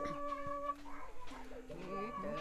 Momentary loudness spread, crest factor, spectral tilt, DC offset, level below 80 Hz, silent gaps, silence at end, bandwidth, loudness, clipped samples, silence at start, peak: 11 LU; 14 dB; -6 dB/octave; under 0.1%; -58 dBFS; none; 0 s; 13.5 kHz; -45 LUFS; under 0.1%; 0 s; -30 dBFS